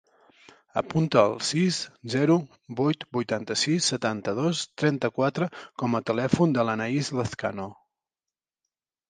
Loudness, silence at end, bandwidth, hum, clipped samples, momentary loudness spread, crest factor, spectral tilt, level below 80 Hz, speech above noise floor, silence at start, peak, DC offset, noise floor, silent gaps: -26 LUFS; 1.35 s; 10 kHz; none; under 0.1%; 9 LU; 22 dB; -5 dB/octave; -60 dBFS; over 64 dB; 0.75 s; -4 dBFS; under 0.1%; under -90 dBFS; none